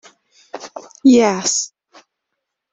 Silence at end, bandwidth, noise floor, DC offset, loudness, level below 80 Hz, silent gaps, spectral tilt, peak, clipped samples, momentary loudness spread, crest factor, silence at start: 1.05 s; 8.2 kHz; -78 dBFS; under 0.1%; -15 LUFS; -62 dBFS; none; -3 dB/octave; -2 dBFS; under 0.1%; 23 LU; 18 dB; 0.55 s